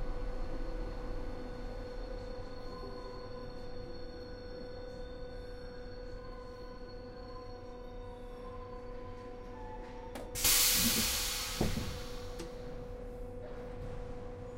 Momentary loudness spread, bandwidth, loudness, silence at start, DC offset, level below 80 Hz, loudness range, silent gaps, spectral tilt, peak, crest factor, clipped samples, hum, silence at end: 18 LU; 16 kHz; -37 LUFS; 0 s; under 0.1%; -44 dBFS; 16 LU; none; -2 dB/octave; -14 dBFS; 24 dB; under 0.1%; none; 0 s